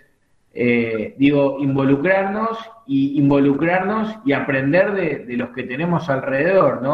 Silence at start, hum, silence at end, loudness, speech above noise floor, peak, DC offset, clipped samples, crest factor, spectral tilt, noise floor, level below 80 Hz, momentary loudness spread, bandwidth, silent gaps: 0.55 s; none; 0 s; -18 LUFS; 41 dB; -2 dBFS; under 0.1%; under 0.1%; 16 dB; -9 dB/octave; -59 dBFS; -54 dBFS; 9 LU; 6 kHz; none